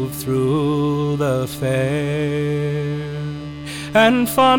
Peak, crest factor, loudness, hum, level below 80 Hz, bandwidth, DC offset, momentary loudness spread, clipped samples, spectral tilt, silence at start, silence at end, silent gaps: -2 dBFS; 16 dB; -19 LUFS; none; -46 dBFS; 18 kHz; under 0.1%; 12 LU; under 0.1%; -6 dB/octave; 0 s; 0 s; none